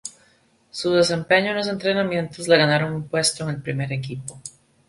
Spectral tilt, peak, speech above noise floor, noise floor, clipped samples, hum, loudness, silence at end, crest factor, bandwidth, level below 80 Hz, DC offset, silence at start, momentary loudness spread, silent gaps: -4 dB/octave; -2 dBFS; 38 dB; -59 dBFS; under 0.1%; none; -21 LUFS; 0.4 s; 20 dB; 11.5 kHz; -58 dBFS; under 0.1%; 0.05 s; 18 LU; none